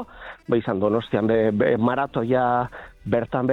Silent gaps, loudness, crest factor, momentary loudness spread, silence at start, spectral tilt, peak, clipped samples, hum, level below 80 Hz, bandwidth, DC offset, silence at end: none; -22 LUFS; 16 dB; 11 LU; 0 s; -9 dB/octave; -6 dBFS; under 0.1%; none; -52 dBFS; 5.8 kHz; under 0.1%; 0 s